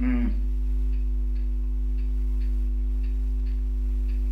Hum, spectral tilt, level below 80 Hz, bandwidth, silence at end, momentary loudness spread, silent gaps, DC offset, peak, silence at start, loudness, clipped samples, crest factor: 50 Hz at -25 dBFS; -9.5 dB/octave; -24 dBFS; 3 kHz; 0 s; 2 LU; none; under 0.1%; -14 dBFS; 0 s; -29 LUFS; under 0.1%; 10 dB